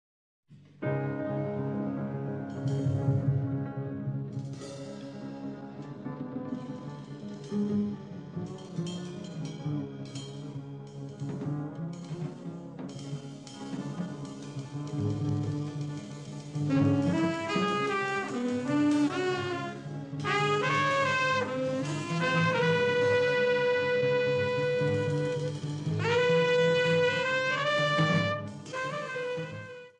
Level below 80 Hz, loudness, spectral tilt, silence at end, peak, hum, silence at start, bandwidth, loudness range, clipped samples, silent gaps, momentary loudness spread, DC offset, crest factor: -66 dBFS; -30 LUFS; -6 dB/octave; 0.1 s; -14 dBFS; none; 0.5 s; 10.5 kHz; 12 LU; under 0.1%; none; 15 LU; under 0.1%; 16 dB